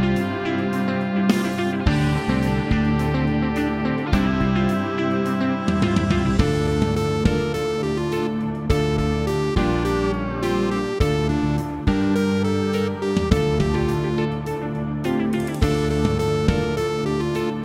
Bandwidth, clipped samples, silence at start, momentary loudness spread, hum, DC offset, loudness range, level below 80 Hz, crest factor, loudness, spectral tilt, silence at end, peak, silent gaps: 16 kHz; under 0.1%; 0 s; 4 LU; none; under 0.1%; 1 LU; -32 dBFS; 18 dB; -22 LUFS; -7 dB/octave; 0 s; -2 dBFS; none